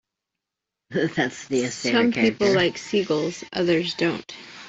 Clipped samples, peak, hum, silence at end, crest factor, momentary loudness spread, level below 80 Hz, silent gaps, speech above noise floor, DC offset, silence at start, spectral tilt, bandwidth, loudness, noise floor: under 0.1%; -6 dBFS; none; 0 s; 18 dB; 7 LU; -60 dBFS; none; 63 dB; under 0.1%; 0.9 s; -4.5 dB/octave; 8.2 kHz; -23 LUFS; -86 dBFS